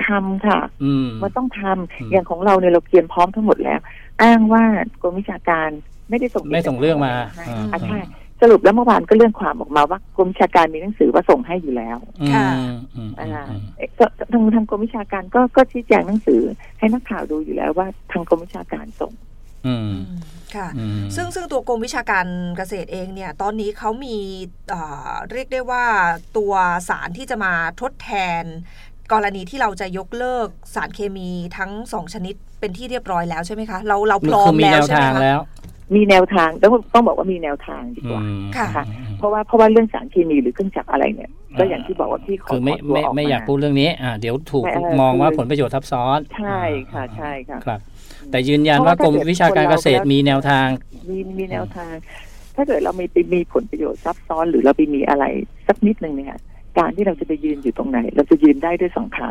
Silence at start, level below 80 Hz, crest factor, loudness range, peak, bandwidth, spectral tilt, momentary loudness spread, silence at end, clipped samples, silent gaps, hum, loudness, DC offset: 0 s; -38 dBFS; 16 dB; 9 LU; -2 dBFS; 14.5 kHz; -6.5 dB/octave; 15 LU; 0 s; under 0.1%; none; none; -18 LUFS; under 0.1%